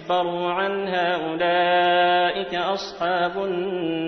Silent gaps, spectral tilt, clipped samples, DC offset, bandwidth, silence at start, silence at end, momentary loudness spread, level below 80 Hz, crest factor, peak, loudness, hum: none; -5.5 dB/octave; under 0.1%; under 0.1%; 6.4 kHz; 0 s; 0 s; 7 LU; -62 dBFS; 14 dB; -8 dBFS; -22 LUFS; none